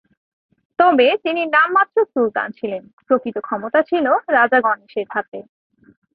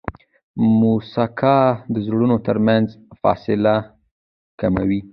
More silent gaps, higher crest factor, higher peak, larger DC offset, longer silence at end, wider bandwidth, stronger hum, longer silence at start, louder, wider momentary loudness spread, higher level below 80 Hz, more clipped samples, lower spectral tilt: second, 2.93-2.98 s, 5.28-5.32 s vs 0.43-0.54 s, 4.11-4.58 s; about the same, 16 dB vs 16 dB; about the same, -2 dBFS vs -2 dBFS; neither; first, 0.75 s vs 0.05 s; about the same, 5 kHz vs 5.4 kHz; neither; first, 0.8 s vs 0.1 s; about the same, -17 LUFS vs -18 LUFS; first, 13 LU vs 8 LU; second, -68 dBFS vs -46 dBFS; neither; second, -8.5 dB/octave vs -10.5 dB/octave